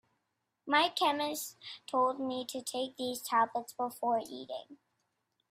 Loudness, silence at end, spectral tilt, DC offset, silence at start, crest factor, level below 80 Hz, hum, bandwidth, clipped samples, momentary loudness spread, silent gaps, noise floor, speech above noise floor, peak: -33 LUFS; 0.75 s; -2 dB/octave; under 0.1%; 0.65 s; 22 dB; -84 dBFS; none; 16 kHz; under 0.1%; 14 LU; none; -83 dBFS; 49 dB; -12 dBFS